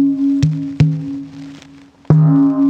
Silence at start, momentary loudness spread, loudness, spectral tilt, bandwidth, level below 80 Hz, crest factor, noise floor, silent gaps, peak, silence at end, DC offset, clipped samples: 0 s; 21 LU; -14 LUFS; -9.5 dB/octave; 7.6 kHz; -44 dBFS; 14 dB; -42 dBFS; none; 0 dBFS; 0 s; under 0.1%; under 0.1%